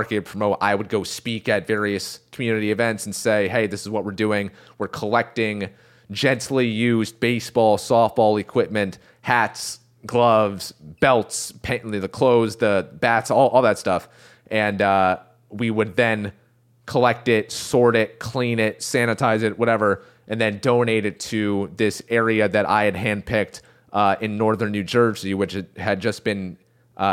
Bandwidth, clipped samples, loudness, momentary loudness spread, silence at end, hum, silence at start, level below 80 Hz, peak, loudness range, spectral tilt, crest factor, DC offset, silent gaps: 16 kHz; under 0.1%; -21 LUFS; 10 LU; 0 s; none; 0 s; -56 dBFS; -2 dBFS; 3 LU; -5 dB/octave; 20 dB; under 0.1%; none